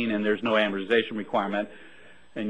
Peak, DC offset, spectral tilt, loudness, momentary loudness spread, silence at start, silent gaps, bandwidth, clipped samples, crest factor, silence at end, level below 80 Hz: -10 dBFS; 0.3%; -6.5 dB/octave; -26 LUFS; 10 LU; 0 s; none; 9 kHz; under 0.1%; 18 dB; 0 s; -66 dBFS